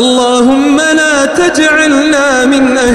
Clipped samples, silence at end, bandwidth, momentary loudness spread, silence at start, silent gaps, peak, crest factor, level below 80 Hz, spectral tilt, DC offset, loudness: under 0.1%; 0 s; 13 kHz; 1 LU; 0 s; none; 0 dBFS; 8 dB; -38 dBFS; -2.5 dB/octave; under 0.1%; -8 LUFS